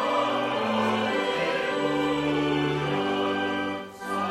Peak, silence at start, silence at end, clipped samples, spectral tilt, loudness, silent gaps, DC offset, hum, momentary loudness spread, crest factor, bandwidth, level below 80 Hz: -12 dBFS; 0 s; 0 s; under 0.1%; -5.5 dB/octave; -26 LUFS; none; under 0.1%; none; 5 LU; 14 dB; 13.5 kHz; -58 dBFS